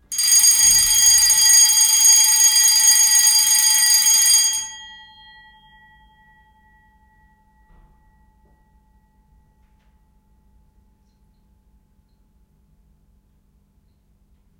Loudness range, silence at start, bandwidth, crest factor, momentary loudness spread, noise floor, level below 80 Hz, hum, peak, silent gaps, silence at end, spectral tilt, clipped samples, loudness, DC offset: 9 LU; 0.1 s; 17.5 kHz; 20 dB; 3 LU; -59 dBFS; -52 dBFS; 50 Hz at -65 dBFS; 0 dBFS; none; 9.75 s; 4.5 dB/octave; under 0.1%; -11 LUFS; under 0.1%